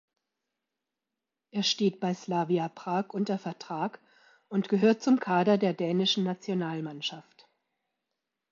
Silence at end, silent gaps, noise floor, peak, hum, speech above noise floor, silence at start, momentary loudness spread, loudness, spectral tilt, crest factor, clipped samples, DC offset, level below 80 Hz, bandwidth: 1.3 s; none; -88 dBFS; -12 dBFS; none; 60 dB; 1.55 s; 10 LU; -29 LUFS; -5.5 dB/octave; 18 dB; under 0.1%; under 0.1%; -80 dBFS; 7.4 kHz